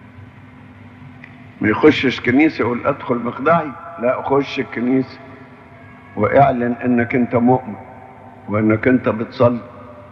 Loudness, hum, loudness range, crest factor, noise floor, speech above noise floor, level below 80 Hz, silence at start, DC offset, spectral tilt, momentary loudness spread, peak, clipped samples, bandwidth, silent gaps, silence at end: -17 LUFS; none; 3 LU; 18 dB; -41 dBFS; 24 dB; -52 dBFS; 0.15 s; under 0.1%; -8 dB/octave; 19 LU; 0 dBFS; under 0.1%; 6.8 kHz; none; 0 s